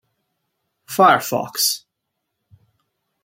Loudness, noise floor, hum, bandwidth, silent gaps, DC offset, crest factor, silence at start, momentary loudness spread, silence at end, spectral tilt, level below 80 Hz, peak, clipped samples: -17 LUFS; -78 dBFS; none; 16.5 kHz; none; under 0.1%; 20 dB; 0.9 s; 13 LU; 1.45 s; -2.5 dB/octave; -72 dBFS; -2 dBFS; under 0.1%